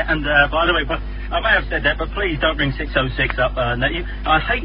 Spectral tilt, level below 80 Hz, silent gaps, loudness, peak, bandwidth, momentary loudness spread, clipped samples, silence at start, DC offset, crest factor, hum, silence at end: -10 dB/octave; -26 dBFS; none; -19 LUFS; 0 dBFS; 5.4 kHz; 6 LU; under 0.1%; 0 s; under 0.1%; 18 dB; 50 Hz at -25 dBFS; 0 s